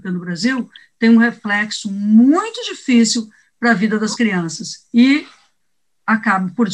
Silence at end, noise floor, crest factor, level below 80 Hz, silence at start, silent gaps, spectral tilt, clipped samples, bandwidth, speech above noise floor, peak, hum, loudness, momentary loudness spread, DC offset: 0 s; -74 dBFS; 16 dB; -68 dBFS; 0.05 s; none; -4.5 dB/octave; under 0.1%; 10.5 kHz; 59 dB; -2 dBFS; none; -16 LUFS; 12 LU; under 0.1%